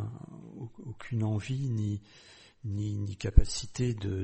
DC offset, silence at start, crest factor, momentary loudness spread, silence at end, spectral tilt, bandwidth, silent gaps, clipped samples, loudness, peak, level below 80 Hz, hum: under 0.1%; 0 s; 26 dB; 18 LU; 0 s; -6 dB/octave; 8.4 kHz; none; under 0.1%; -32 LUFS; -4 dBFS; -34 dBFS; none